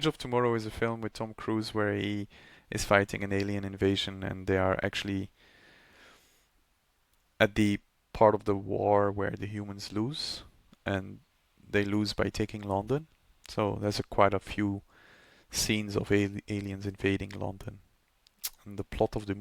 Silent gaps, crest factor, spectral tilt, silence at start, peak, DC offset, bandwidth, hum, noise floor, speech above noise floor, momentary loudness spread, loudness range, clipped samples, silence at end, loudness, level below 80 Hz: none; 24 dB; -5 dB/octave; 0 s; -6 dBFS; under 0.1%; 18.5 kHz; none; -72 dBFS; 42 dB; 13 LU; 5 LU; under 0.1%; 0 s; -31 LUFS; -54 dBFS